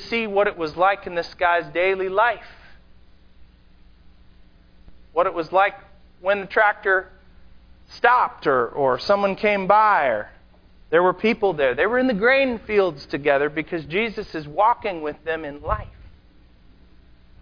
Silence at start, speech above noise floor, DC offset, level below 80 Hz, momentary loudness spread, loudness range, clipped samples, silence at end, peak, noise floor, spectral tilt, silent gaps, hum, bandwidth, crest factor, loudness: 0 s; 31 dB; under 0.1%; -48 dBFS; 11 LU; 7 LU; under 0.1%; 1.4 s; -2 dBFS; -51 dBFS; -6.5 dB/octave; none; none; 5.2 kHz; 20 dB; -21 LUFS